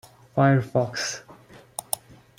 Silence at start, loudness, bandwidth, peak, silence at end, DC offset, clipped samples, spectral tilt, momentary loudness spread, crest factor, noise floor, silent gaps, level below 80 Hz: 0.35 s; -25 LUFS; 16.5 kHz; -4 dBFS; 0.45 s; under 0.1%; under 0.1%; -5 dB/octave; 17 LU; 22 dB; -49 dBFS; none; -62 dBFS